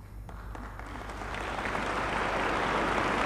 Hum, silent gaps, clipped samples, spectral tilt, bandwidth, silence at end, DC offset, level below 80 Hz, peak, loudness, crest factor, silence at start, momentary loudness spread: none; none; under 0.1%; -4.5 dB/octave; 14 kHz; 0 s; under 0.1%; -44 dBFS; -14 dBFS; -31 LUFS; 18 dB; 0 s; 15 LU